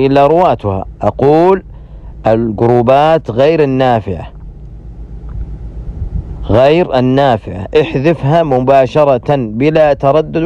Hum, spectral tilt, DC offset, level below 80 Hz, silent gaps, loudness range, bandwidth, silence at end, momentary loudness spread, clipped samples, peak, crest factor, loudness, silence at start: none; -8.5 dB/octave; under 0.1%; -28 dBFS; none; 5 LU; 9.2 kHz; 0 s; 18 LU; under 0.1%; 0 dBFS; 12 dB; -11 LUFS; 0 s